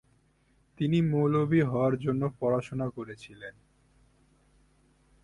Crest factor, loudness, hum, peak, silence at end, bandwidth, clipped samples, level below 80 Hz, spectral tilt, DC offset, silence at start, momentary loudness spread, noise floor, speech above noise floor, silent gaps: 18 dB; -28 LUFS; none; -14 dBFS; 1.75 s; 11 kHz; under 0.1%; -60 dBFS; -9 dB/octave; under 0.1%; 0.8 s; 19 LU; -67 dBFS; 39 dB; none